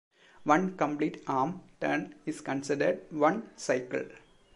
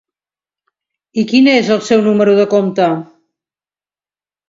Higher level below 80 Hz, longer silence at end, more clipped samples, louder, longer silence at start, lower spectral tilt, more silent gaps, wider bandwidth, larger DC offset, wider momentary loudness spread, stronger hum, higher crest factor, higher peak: second, -70 dBFS vs -62 dBFS; second, 0.35 s vs 1.45 s; neither; second, -31 LUFS vs -12 LUFS; second, 0.4 s vs 1.15 s; about the same, -5.5 dB/octave vs -5.5 dB/octave; neither; first, 11.5 kHz vs 7.8 kHz; neither; about the same, 10 LU vs 10 LU; neither; first, 22 dB vs 14 dB; second, -8 dBFS vs 0 dBFS